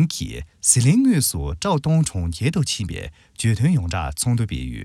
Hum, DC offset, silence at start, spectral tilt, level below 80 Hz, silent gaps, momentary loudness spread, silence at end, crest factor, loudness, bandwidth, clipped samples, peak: none; under 0.1%; 0 s; -5 dB/octave; -38 dBFS; none; 12 LU; 0 s; 20 dB; -20 LUFS; 15 kHz; under 0.1%; -2 dBFS